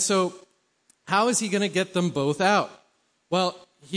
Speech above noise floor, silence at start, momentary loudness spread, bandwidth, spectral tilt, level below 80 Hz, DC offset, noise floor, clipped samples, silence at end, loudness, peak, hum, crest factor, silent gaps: 42 dB; 0 s; 7 LU; 10.5 kHz; -3.5 dB/octave; -70 dBFS; under 0.1%; -66 dBFS; under 0.1%; 0 s; -24 LUFS; -8 dBFS; none; 18 dB; none